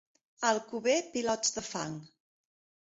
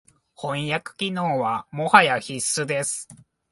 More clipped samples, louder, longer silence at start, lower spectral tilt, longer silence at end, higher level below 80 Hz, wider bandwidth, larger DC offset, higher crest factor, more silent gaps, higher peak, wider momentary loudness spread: neither; second, -32 LUFS vs -22 LUFS; about the same, 0.4 s vs 0.4 s; about the same, -2.5 dB/octave vs -3 dB/octave; first, 0.8 s vs 0.35 s; second, -72 dBFS vs -66 dBFS; second, 8 kHz vs 12 kHz; neither; about the same, 22 dB vs 24 dB; neither; second, -12 dBFS vs 0 dBFS; second, 9 LU vs 14 LU